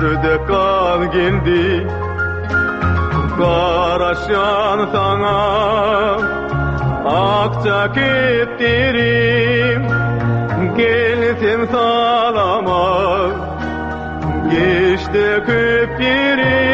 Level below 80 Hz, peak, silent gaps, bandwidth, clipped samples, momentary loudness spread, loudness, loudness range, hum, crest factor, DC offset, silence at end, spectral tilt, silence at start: -32 dBFS; -2 dBFS; none; 8 kHz; under 0.1%; 6 LU; -15 LUFS; 2 LU; none; 12 dB; under 0.1%; 0 s; -7.5 dB/octave; 0 s